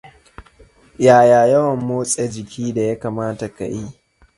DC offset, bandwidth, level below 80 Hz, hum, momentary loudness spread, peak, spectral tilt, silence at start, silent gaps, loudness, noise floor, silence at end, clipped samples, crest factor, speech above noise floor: under 0.1%; 11.5 kHz; -50 dBFS; none; 16 LU; 0 dBFS; -5.5 dB/octave; 0.05 s; none; -17 LUFS; -49 dBFS; 0.45 s; under 0.1%; 18 dB; 33 dB